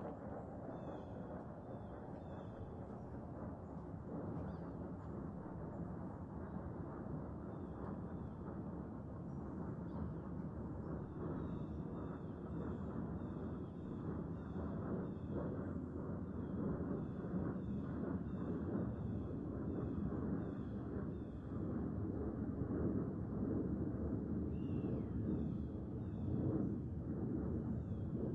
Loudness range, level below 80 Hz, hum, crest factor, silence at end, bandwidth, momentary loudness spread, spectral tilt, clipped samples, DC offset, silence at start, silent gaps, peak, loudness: 7 LU; -56 dBFS; none; 16 dB; 0 s; 4.7 kHz; 8 LU; -11 dB/octave; under 0.1%; under 0.1%; 0 s; none; -28 dBFS; -45 LUFS